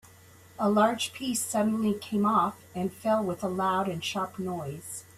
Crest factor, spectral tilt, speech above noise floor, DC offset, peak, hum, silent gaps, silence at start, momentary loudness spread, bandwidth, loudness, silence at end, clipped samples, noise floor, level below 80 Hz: 18 dB; -4.5 dB/octave; 26 dB; under 0.1%; -10 dBFS; none; none; 0.6 s; 10 LU; 15.5 kHz; -28 LUFS; 0.15 s; under 0.1%; -54 dBFS; -66 dBFS